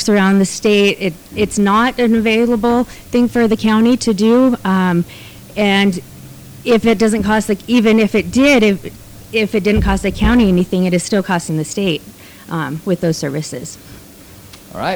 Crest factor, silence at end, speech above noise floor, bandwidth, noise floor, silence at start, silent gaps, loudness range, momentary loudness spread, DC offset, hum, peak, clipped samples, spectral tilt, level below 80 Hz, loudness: 10 dB; 0 s; 25 dB; over 20 kHz; -38 dBFS; 0 s; none; 5 LU; 12 LU; under 0.1%; none; -4 dBFS; under 0.1%; -5.5 dB/octave; -32 dBFS; -14 LUFS